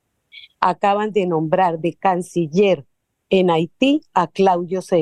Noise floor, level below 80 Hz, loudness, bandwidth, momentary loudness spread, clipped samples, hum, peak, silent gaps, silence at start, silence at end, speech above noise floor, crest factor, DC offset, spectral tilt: -45 dBFS; -64 dBFS; -18 LUFS; 12 kHz; 4 LU; under 0.1%; none; 0 dBFS; none; 0.35 s; 0 s; 28 dB; 18 dB; under 0.1%; -6.5 dB/octave